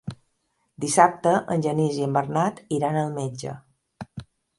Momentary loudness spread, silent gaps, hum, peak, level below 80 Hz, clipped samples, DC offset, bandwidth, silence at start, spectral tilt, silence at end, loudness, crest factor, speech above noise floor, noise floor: 21 LU; none; none; -2 dBFS; -60 dBFS; under 0.1%; under 0.1%; 11.5 kHz; 0.05 s; -5.5 dB/octave; 0.35 s; -23 LUFS; 22 dB; 49 dB; -72 dBFS